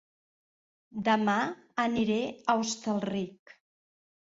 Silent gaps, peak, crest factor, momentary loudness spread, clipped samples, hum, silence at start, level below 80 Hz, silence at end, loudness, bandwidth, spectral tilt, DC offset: none; -12 dBFS; 20 dB; 8 LU; under 0.1%; none; 0.95 s; -68 dBFS; 0.95 s; -30 LUFS; 7.8 kHz; -4.5 dB/octave; under 0.1%